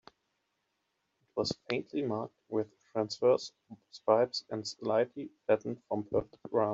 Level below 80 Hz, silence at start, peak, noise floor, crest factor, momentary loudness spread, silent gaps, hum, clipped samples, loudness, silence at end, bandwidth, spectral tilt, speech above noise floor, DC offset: -70 dBFS; 1.35 s; -12 dBFS; -81 dBFS; 22 dB; 10 LU; none; none; under 0.1%; -33 LUFS; 0 s; 8 kHz; -5 dB/octave; 49 dB; under 0.1%